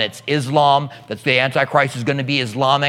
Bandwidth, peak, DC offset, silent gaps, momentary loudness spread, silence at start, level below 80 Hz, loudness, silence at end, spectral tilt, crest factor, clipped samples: 15 kHz; 0 dBFS; under 0.1%; none; 7 LU; 0 s; -66 dBFS; -17 LUFS; 0 s; -5 dB/octave; 18 dB; under 0.1%